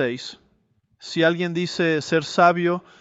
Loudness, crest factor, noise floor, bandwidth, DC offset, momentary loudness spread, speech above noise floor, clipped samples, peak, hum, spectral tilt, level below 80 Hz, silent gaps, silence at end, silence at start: -21 LUFS; 18 dB; -65 dBFS; 8 kHz; under 0.1%; 15 LU; 44 dB; under 0.1%; -4 dBFS; none; -5.5 dB/octave; -66 dBFS; none; 0.2 s; 0 s